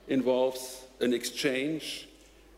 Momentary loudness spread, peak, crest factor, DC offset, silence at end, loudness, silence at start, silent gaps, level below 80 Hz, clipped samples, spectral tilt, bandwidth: 13 LU; -16 dBFS; 14 dB; under 0.1%; 0.5 s; -30 LUFS; 0.05 s; none; -64 dBFS; under 0.1%; -3.5 dB/octave; 16 kHz